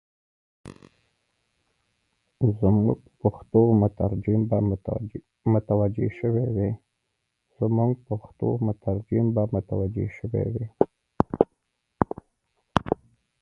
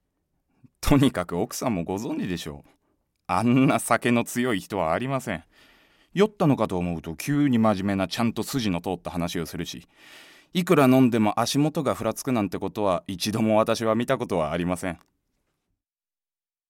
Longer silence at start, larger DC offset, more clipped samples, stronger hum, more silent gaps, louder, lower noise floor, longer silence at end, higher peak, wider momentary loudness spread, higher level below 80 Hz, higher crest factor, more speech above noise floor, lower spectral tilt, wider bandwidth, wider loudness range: second, 0.65 s vs 0.8 s; neither; neither; neither; neither; about the same, -25 LUFS vs -24 LUFS; second, -78 dBFS vs under -90 dBFS; second, 0.45 s vs 1.75 s; first, 0 dBFS vs -4 dBFS; about the same, 9 LU vs 11 LU; about the same, -46 dBFS vs -46 dBFS; first, 26 dB vs 20 dB; second, 54 dB vs over 66 dB; first, -10.5 dB/octave vs -5.5 dB/octave; second, 6.4 kHz vs 17 kHz; about the same, 4 LU vs 3 LU